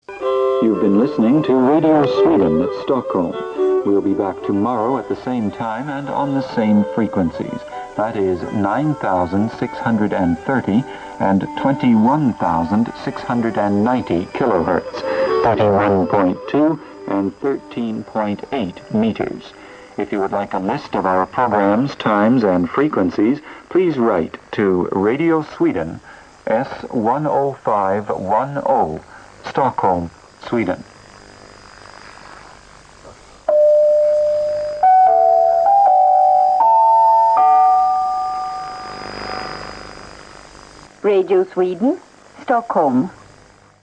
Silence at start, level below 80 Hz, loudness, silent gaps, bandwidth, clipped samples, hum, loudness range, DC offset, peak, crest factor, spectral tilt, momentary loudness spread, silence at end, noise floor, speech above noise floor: 0.1 s; -50 dBFS; -17 LUFS; none; 9.4 kHz; under 0.1%; none; 9 LU; under 0.1%; -4 dBFS; 12 dB; -8 dB/octave; 14 LU; 0.65 s; -47 dBFS; 30 dB